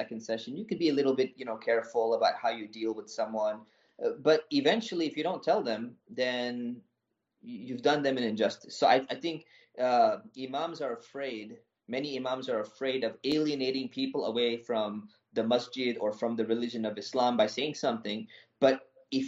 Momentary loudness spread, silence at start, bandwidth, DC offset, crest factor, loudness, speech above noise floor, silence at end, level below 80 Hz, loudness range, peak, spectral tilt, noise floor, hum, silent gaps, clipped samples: 11 LU; 0 s; 8 kHz; under 0.1%; 20 dB; -31 LUFS; 52 dB; 0 s; -80 dBFS; 3 LU; -10 dBFS; -3 dB/octave; -82 dBFS; none; none; under 0.1%